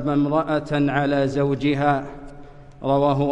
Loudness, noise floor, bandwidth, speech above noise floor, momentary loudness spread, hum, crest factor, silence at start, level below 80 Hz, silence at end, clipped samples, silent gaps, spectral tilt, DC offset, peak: -21 LUFS; -41 dBFS; 8.6 kHz; 21 dB; 8 LU; none; 14 dB; 0 s; -44 dBFS; 0 s; under 0.1%; none; -8 dB/octave; under 0.1%; -8 dBFS